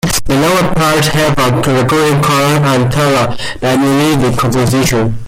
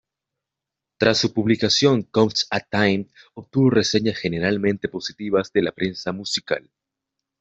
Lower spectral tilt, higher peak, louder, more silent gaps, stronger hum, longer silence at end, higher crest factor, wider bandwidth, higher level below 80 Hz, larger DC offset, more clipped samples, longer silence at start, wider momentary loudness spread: about the same, -5 dB/octave vs -5 dB/octave; about the same, -2 dBFS vs -4 dBFS; first, -11 LUFS vs -21 LUFS; neither; neither; second, 0 s vs 0.8 s; second, 8 dB vs 18 dB; first, 16.5 kHz vs 8.2 kHz; first, -30 dBFS vs -58 dBFS; neither; neither; second, 0.05 s vs 1 s; second, 2 LU vs 10 LU